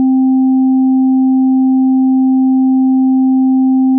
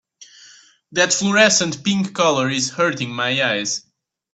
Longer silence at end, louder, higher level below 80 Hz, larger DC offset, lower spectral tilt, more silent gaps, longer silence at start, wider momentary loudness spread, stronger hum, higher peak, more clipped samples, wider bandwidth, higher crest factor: second, 0 s vs 0.55 s; first, -11 LUFS vs -18 LUFS; second, under -90 dBFS vs -64 dBFS; neither; second, -1 dB/octave vs -2.5 dB/octave; neither; second, 0 s vs 0.2 s; second, 0 LU vs 9 LU; neither; second, -6 dBFS vs 0 dBFS; neither; second, 0.8 kHz vs 9 kHz; second, 4 dB vs 20 dB